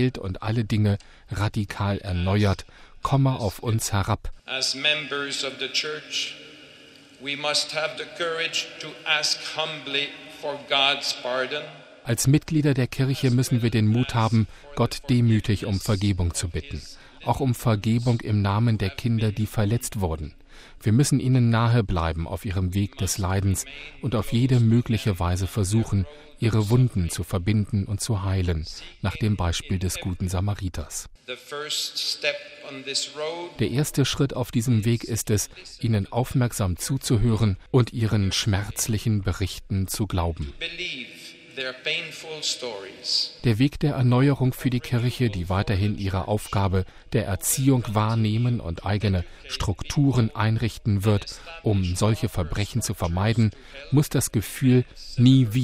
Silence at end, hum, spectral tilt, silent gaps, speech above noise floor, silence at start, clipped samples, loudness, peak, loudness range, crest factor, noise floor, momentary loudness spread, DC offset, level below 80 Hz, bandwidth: 0 s; none; -5 dB/octave; none; 25 dB; 0 s; under 0.1%; -24 LUFS; -6 dBFS; 4 LU; 18 dB; -49 dBFS; 10 LU; under 0.1%; -42 dBFS; 16 kHz